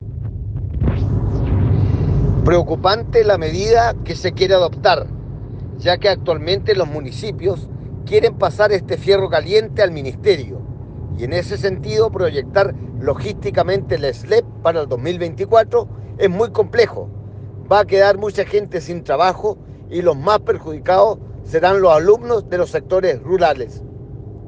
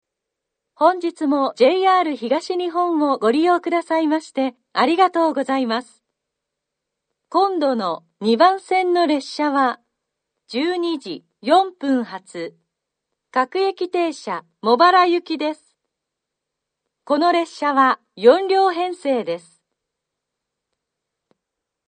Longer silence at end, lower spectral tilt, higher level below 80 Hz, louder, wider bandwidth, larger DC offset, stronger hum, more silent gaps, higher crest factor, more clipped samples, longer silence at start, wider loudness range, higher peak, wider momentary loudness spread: second, 0 s vs 2.5 s; first, -6.5 dB/octave vs -4.5 dB/octave; first, -32 dBFS vs -74 dBFS; about the same, -17 LUFS vs -19 LUFS; about the same, 8.8 kHz vs 9.4 kHz; neither; neither; neither; about the same, 16 dB vs 20 dB; neither; second, 0 s vs 0.8 s; about the same, 3 LU vs 4 LU; about the same, 0 dBFS vs 0 dBFS; first, 14 LU vs 11 LU